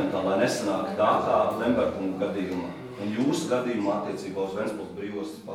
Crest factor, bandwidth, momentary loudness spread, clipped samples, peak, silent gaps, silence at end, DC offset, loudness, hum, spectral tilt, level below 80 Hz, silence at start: 18 dB; 17 kHz; 11 LU; under 0.1%; -10 dBFS; none; 0 s; under 0.1%; -27 LUFS; none; -5.5 dB/octave; -60 dBFS; 0 s